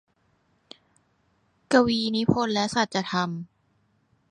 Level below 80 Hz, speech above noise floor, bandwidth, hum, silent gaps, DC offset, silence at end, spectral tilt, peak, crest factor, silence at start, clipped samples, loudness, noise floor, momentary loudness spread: -58 dBFS; 44 dB; 11 kHz; none; none; under 0.1%; 0.85 s; -5 dB/octave; -4 dBFS; 22 dB; 1.7 s; under 0.1%; -24 LUFS; -68 dBFS; 10 LU